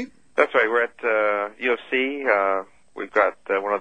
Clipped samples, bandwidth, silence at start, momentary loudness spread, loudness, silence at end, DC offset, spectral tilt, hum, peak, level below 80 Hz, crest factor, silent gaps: under 0.1%; 9.2 kHz; 0 s; 7 LU; -22 LUFS; 0 s; 0.2%; -4.5 dB/octave; none; -2 dBFS; -68 dBFS; 22 dB; none